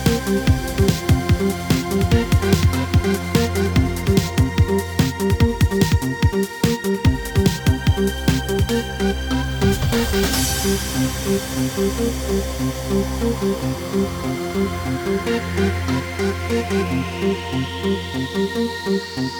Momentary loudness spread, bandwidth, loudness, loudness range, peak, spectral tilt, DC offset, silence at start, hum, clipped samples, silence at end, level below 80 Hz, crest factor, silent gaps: 5 LU; over 20 kHz; -20 LUFS; 4 LU; -4 dBFS; -5.5 dB/octave; under 0.1%; 0 s; none; under 0.1%; 0 s; -28 dBFS; 16 dB; none